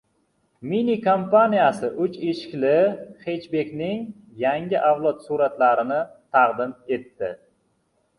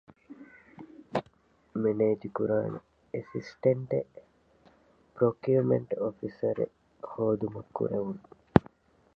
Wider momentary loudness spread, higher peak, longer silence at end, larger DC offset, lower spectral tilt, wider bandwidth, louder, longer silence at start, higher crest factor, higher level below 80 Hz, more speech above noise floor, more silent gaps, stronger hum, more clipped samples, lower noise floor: second, 13 LU vs 18 LU; second, -4 dBFS vs 0 dBFS; first, 0.8 s vs 0.6 s; neither; second, -7 dB/octave vs -9.5 dB/octave; first, 11 kHz vs 6.8 kHz; first, -22 LUFS vs -30 LUFS; first, 0.6 s vs 0.3 s; second, 18 dB vs 30 dB; second, -66 dBFS vs -58 dBFS; first, 47 dB vs 34 dB; neither; neither; neither; first, -68 dBFS vs -64 dBFS